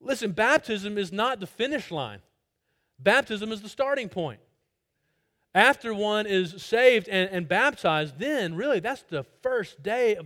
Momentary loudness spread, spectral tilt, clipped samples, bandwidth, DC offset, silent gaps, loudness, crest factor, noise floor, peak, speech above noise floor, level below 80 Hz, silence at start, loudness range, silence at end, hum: 12 LU; -4.5 dB/octave; under 0.1%; 16.5 kHz; under 0.1%; none; -25 LUFS; 24 dB; -78 dBFS; -2 dBFS; 52 dB; -66 dBFS; 0.05 s; 6 LU; 0 s; none